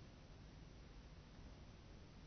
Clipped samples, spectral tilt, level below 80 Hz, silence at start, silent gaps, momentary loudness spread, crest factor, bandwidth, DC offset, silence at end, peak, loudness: under 0.1%; -5.5 dB/octave; -62 dBFS; 0 s; none; 1 LU; 12 dB; 6.4 kHz; under 0.1%; 0 s; -46 dBFS; -61 LUFS